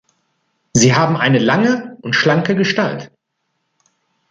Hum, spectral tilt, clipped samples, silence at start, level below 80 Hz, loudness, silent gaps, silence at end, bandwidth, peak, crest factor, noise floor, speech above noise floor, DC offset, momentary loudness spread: none; -4.5 dB/octave; under 0.1%; 0.75 s; -54 dBFS; -15 LUFS; none; 1.25 s; 9.6 kHz; 0 dBFS; 16 dB; -72 dBFS; 57 dB; under 0.1%; 8 LU